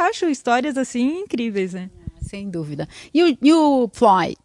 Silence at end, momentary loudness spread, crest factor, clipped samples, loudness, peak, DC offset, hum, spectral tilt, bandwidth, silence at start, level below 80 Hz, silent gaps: 0.1 s; 17 LU; 16 dB; under 0.1%; -19 LUFS; -2 dBFS; under 0.1%; none; -5.5 dB/octave; 11.5 kHz; 0 s; -48 dBFS; none